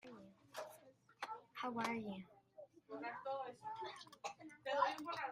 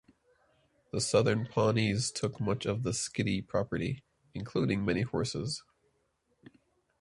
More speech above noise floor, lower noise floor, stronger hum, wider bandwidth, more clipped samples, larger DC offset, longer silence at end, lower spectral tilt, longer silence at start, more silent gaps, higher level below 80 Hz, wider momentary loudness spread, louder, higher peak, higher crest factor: second, 22 dB vs 44 dB; second, -66 dBFS vs -75 dBFS; neither; first, 15.5 kHz vs 11.5 kHz; neither; neither; second, 0 s vs 1.4 s; about the same, -4 dB/octave vs -5 dB/octave; second, 0.05 s vs 0.95 s; neither; second, -88 dBFS vs -58 dBFS; first, 22 LU vs 10 LU; second, -46 LUFS vs -32 LUFS; second, -22 dBFS vs -14 dBFS; first, 26 dB vs 20 dB